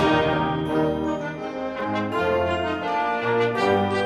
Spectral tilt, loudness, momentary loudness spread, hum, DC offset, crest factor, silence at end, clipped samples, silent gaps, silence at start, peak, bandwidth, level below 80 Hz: -6.5 dB/octave; -23 LUFS; 8 LU; none; under 0.1%; 14 dB; 0 s; under 0.1%; none; 0 s; -8 dBFS; 13 kHz; -48 dBFS